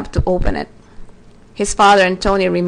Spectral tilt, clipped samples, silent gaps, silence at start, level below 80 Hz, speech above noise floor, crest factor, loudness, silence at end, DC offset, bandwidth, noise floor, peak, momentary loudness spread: -4.5 dB/octave; under 0.1%; none; 0 s; -26 dBFS; 27 dB; 14 dB; -15 LUFS; 0 s; under 0.1%; 10 kHz; -41 dBFS; -2 dBFS; 14 LU